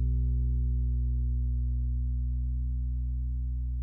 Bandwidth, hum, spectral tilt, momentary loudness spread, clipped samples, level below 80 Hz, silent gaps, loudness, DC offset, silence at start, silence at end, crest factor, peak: 0.5 kHz; 60 Hz at -70 dBFS; -13.5 dB/octave; 4 LU; under 0.1%; -28 dBFS; none; -32 LUFS; under 0.1%; 0 s; 0 s; 8 dB; -22 dBFS